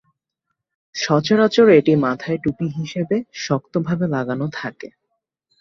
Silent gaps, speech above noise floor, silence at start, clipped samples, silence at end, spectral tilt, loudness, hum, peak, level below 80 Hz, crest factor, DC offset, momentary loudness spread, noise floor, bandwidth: none; 60 dB; 0.95 s; under 0.1%; 0.75 s; -6 dB/octave; -19 LUFS; none; -2 dBFS; -58 dBFS; 18 dB; under 0.1%; 16 LU; -78 dBFS; 7.4 kHz